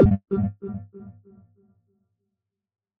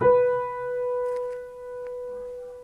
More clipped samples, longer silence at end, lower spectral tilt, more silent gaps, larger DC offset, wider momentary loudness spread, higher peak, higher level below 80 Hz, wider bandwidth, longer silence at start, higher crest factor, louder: neither; first, 1.9 s vs 0 s; first, -12 dB/octave vs -7.5 dB/octave; neither; neither; first, 23 LU vs 15 LU; first, -4 dBFS vs -10 dBFS; first, -40 dBFS vs -58 dBFS; second, 3.8 kHz vs 4.3 kHz; about the same, 0 s vs 0 s; first, 22 dB vs 16 dB; about the same, -26 LUFS vs -28 LUFS